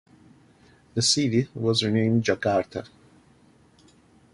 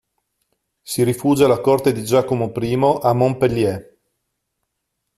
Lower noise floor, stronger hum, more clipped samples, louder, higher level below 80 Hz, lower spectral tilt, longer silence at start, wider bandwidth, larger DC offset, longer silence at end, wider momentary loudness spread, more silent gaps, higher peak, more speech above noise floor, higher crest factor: second, -57 dBFS vs -76 dBFS; neither; neither; second, -23 LUFS vs -18 LUFS; second, -58 dBFS vs -52 dBFS; second, -4.5 dB/octave vs -6.5 dB/octave; about the same, 0.95 s vs 0.85 s; second, 11.5 kHz vs 14.5 kHz; neither; about the same, 1.45 s vs 1.35 s; first, 11 LU vs 7 LU; neither; second, -6 dBFS vs -2 dBFS; second, 34 dB vs 59 dB; about the same, 20 dB vs 16 dB